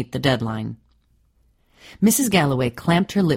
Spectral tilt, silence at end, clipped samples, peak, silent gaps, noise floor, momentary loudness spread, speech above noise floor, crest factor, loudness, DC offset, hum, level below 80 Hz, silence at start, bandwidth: -5 dB/octave; 0 s; under 0.1%; -4 dBFS; none; -61 dBFS; 10 LU; 41 dB; 18 dB; -20 LUFS; under 0.1%; none; -50 dBFS; 0 s; 16 kHz